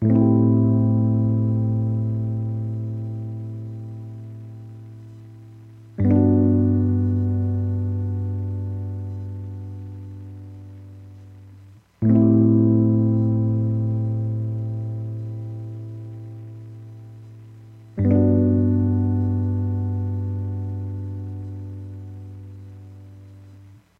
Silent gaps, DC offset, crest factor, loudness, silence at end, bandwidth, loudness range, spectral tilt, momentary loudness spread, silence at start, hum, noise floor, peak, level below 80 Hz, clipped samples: none; under 0.1%; 16 dB; -22 LUFS; 0.25 s; 2.4 kHz; 13 LU; -12.5 dB/octave; 23 LU; 0 s; none; -47 dBFS; -6 dBFS; -52 dBFS; under 0.1%